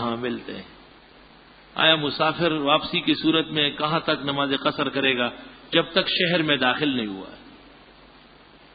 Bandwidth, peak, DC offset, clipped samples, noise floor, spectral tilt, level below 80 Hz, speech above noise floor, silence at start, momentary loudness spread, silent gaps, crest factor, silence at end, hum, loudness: 5 kHz; -4 dBFS; under 0.1%; under 0.1%; -51 dBFS; -9.5 dB/octave; -58 dBFS; 27 dB; 0 s; 13 LU; none; 22 dB; 1.2 s; none; -22 LUFS